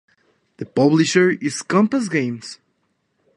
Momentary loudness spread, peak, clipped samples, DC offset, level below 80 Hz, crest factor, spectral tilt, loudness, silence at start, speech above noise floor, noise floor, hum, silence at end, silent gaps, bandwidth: 17 LU; -2 dBFS; under 0.1%; under 0.1%; -66 dBFS; 18 dB; -5 dB/octave; -18 LUFS; 0.6 s; 51 dB; -69 dBFS; none; 0.8 s; none; 11.5 kHz